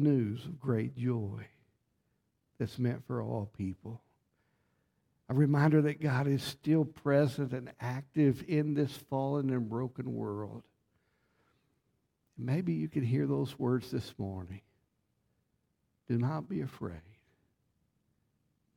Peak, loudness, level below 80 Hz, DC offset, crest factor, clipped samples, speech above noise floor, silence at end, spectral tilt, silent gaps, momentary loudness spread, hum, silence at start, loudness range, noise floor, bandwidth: -14 dBFS; -33 LUFS; -68 dBFS; under 0.1%; 20 dB; under 0.1%; 47 dB; 1.75 s; -8 dB/octave; none; 13 LU; none; 0 s; 10 LU; -79 dBFS; 16 kHz